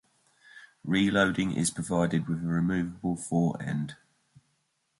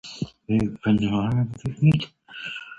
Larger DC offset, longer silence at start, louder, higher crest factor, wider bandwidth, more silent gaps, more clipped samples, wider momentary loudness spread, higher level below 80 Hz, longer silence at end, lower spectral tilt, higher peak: neither; first, 0.55 s vs 0.05 s; second, -28 LUFS vs -24 LUFS; about the same, 20 dB vs 16 dB; first, 11.5 kHz vs 8 kHz; neither; neither; second, 8 LU vs 14 LU; second, -56 dBFS vs -48 dBFS; first, 1.05 s vs 0.05 s; second, -5.5 dB/octave vs -7.5 dB/octave; about the same, -10 dBFS vs -8 dBFS